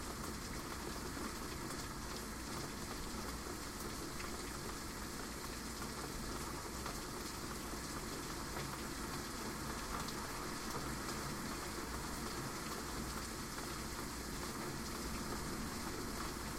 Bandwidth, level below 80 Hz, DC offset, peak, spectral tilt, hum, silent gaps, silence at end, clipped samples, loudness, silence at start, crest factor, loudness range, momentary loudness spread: 16 kHz; -52 dBFS; under 0.1%; -28 dBFS; -3.5 dB/octave; none; none; 0 s; under 0.1%; -44 LUFS; 0 s; 16 dB; 2 LU; 2 LU